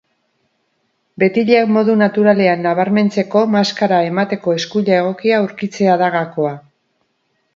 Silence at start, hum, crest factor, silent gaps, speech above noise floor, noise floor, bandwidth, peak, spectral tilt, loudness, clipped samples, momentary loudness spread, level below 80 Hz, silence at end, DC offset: 1.2 s; none; 16 dB; none; 52 dB; -66 dBFS; 7.4 kHz; 0 dBFS; -6.5 dB/octave; -15 LUFS; under 0.1%; 6 LU; -64 dBFS; 0.95 s; under 0.1%